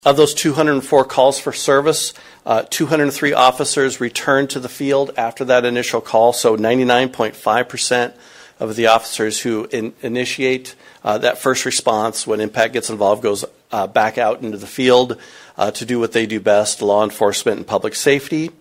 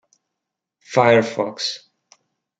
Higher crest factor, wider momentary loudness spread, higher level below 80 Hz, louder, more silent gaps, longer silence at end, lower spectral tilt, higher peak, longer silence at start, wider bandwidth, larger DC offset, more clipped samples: about the same, 16 dB vs 20 dB; about the same, 10 LU vs 11 LU; first, -58 dBFS vs -68 dBFS; about the same, -17 LUFS vs -19 LUFS; neither; second, 0.1 s vs 0.85 s; about the same, -3.5 dB/octave vs -4.5 dB/octave; about the same, 0 dBFS vs -2 dBFS; second, 0.05 s vs 0.9 s; first, 16 kHz vs 9 kHz; neither; neither